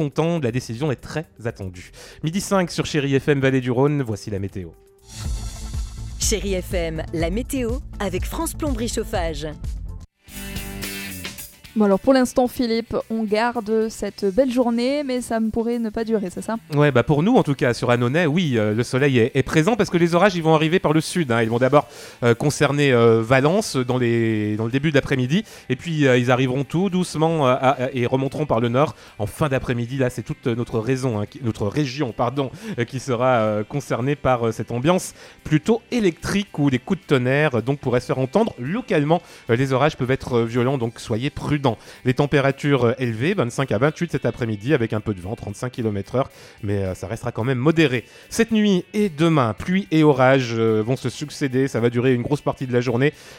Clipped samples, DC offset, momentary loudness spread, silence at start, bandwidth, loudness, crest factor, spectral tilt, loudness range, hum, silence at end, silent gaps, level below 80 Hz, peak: under 0.1%; under 0.1%; 12 LU; 0 s; 17 kHz; -21 LUFS; 18 dB; -6 dB/octave; 7 LU; none; 0 s; none; -40 dBFS; -2 dBFS